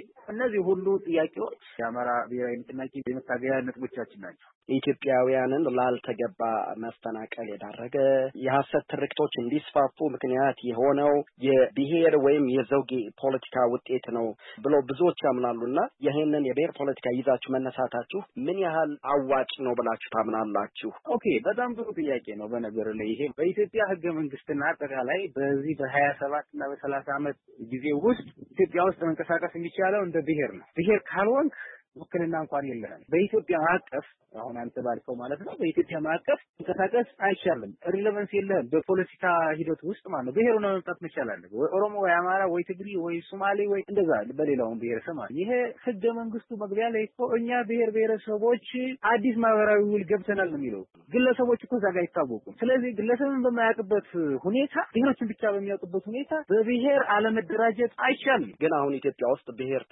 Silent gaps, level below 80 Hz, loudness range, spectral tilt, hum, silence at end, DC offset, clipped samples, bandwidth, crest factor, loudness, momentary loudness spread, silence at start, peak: 4.55-4.61 s, 31.88-31.92 s, 36.49-36.54 s; -70 dBFS; 4 LU; -10 dB/octave; none; 0.1 s; under 0.1%; under 0.1%; 4 kHz; 16 dB; -27 LUFS; 10 LU; 0 s; -10 dBFS